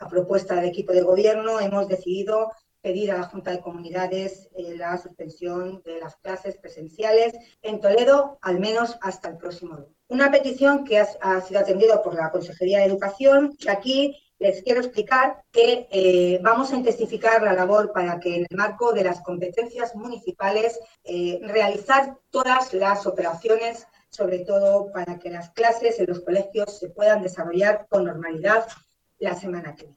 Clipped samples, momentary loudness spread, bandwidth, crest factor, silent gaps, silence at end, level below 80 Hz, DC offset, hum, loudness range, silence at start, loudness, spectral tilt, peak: under 0.1%; 14 LU; 9 kHz; 16 dB; none; 0.1 s; -64 dBFS; under 0.1%; none; 7 LU; 0 s; -22 LUFS; -5 dB/octave; -6 dBFS